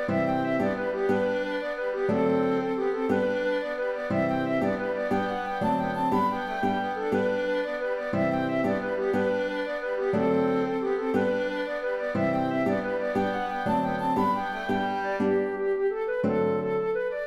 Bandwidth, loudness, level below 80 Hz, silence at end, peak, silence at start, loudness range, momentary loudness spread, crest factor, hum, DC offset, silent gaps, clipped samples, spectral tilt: 13.5 kHz; -27 LUFS; -56 dBFS; 0 s; -12 dBFS; 0 s; 1 LU; 4 LU; 14 dB; none; under 0.1%; none; under 0.1%; -7.5 dB/octave